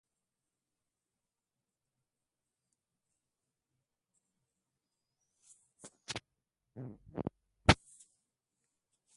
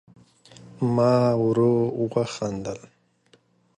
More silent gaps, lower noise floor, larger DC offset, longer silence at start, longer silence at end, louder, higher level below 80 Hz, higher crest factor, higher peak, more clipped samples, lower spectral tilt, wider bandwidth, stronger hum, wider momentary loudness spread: neither; first, under -90 dBFS vs -61 dBFS; neither; first, 5.85 s vs 0.65 s; first, 1.4 s vs 1 s; second, -35 LUFS vs -23 LUFS; first, -54 dBFS vs -60 dBFS; first, 36 dB vs 16 dB; about the same, -8 dBFS vs -8 dBFS; neither; second, -4.5 dB/octave vs -7.5 dB/octave; about the same, 11.5 kHz vs 11 kHz; neither; first, 27 LU vs 13 LU